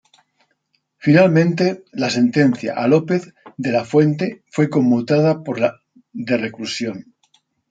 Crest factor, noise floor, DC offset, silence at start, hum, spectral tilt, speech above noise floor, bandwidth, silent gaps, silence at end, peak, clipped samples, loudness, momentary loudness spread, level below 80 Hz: 16 dB; -68 dBFS; under 0.1%; 1.05 s; none; -7 dB/octave; 51 dB; 9 kHz; none; 0.7 s; -2 dBFS; under 0.1%; -18 LUFS; 11 LU; -64 dBFS